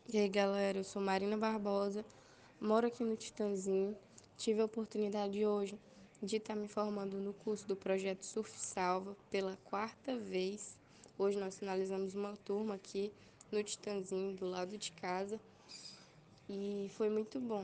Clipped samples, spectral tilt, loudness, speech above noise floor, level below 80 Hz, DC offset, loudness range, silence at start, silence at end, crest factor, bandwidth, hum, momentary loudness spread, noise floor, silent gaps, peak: under 0.1%; -5 dB/octave; -39 LUFS; 24 dB; -78 dBFS; under 0.1%; 5 LU; 0.1 s; 0 s; 20 dB; 9.8 kHz; none; 12 LU; -62 dBFS; none; -20 dBFS